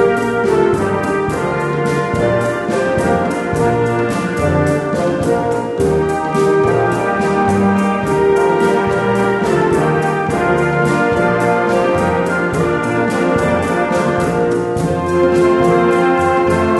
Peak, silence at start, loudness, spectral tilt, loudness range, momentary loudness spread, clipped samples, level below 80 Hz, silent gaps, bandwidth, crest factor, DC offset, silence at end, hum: -2 dBFS; 0 s; -15 LUFS; -6.5 dB/octave; 2 LU; 4 LU; under 0.1%; -38 dBFS; none; 12 kHz; 12 dB; under 0.1%; 0 s; none